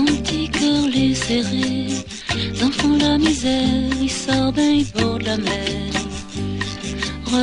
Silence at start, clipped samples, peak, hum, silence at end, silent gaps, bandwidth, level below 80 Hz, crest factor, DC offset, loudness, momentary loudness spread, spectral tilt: 0 s; under 0.1%; -4 dBFS; none; 0 s; none; 10.5 kHz; -36 dBFS; 16 dB; under 0.1%; -20 LUFS; 8 LU; -4.5 dB/octave